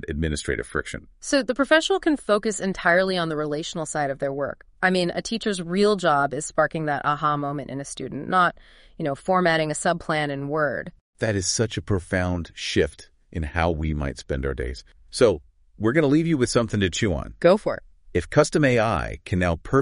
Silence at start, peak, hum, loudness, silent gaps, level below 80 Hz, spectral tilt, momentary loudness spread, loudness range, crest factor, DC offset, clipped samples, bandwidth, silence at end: 0 s; -4 dBFS; none; -23 LUFS; 11.01-11.13 s; -40 dBFS; -5 dB/octave; 11 LU; 4 LU; 20 dB; under 0.1%; under 0.1%; 10.5 kHz; 0 s